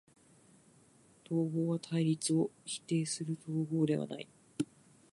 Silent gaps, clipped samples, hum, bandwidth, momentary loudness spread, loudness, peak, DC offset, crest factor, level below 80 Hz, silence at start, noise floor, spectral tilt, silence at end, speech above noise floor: none; under 0.1%; none; 11.5 kHz; 10 LU; -35 LUFS; -20 dBFS; under 0.1%; 16 dB; -78 dBFS; 1.3 s; -64 dBFS; -6 dB/octave; 0.5 s; 30 dB